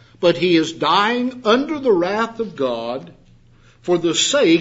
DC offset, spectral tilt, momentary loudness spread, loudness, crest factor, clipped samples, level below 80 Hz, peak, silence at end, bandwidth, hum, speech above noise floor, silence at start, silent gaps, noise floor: under 0.1%; -3.5 dB/octave; 9 LU; -18 LUFS; 16 dB; under 0.1%; -58 dBFS; -2 dBFS; 0 s; 8 kHz; none; 32 dB; 0.2 s; none; -50 dBFS